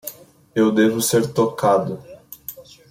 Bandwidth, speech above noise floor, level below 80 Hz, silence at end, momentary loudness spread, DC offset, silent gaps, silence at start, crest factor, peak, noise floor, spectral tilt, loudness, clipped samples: 16.5 kHz; 22 dB; -60 dBFS; 0.3 s; 19 LU; under 0.1%; none; 0.05 s; 14 dB; -6 dBFS; -39 dBFS; -5 dB/octave; -19 LUFS; under 0.1%